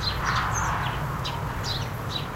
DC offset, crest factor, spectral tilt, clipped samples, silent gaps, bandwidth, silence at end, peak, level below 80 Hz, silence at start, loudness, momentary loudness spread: under 0.1%; 18 dB; -4 dB/octave; under 0.1%; none; 16 kHz; 0 s; -10 dBFS; -38 dBFS; 0 s; -28 LUFS; 5 LU